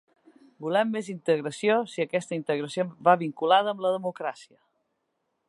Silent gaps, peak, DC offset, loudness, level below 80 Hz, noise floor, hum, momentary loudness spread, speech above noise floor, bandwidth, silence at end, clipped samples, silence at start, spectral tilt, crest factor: none; -6 dBFS; under 0.1%; -26 LUFS; -82 dBFS; -78 dBFS; none; 9 LU; 52 dB; 11.5 kHz; 1.05 s; under 0.1%; 0.6 s; -5 dB/octave; 22 dB